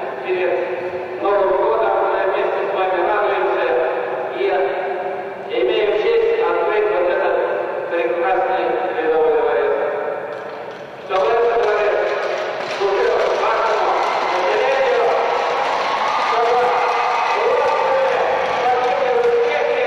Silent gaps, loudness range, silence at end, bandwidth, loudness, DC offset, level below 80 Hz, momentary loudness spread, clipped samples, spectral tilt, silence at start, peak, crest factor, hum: none; 2 LU; 0 s; 9.6 kHz; -18 LUFS; under 0.1%; -56 dBFS; 7 LU; under 0.1%; -4 dB/octave; 0 s; -6 dBFS; 12 dB; none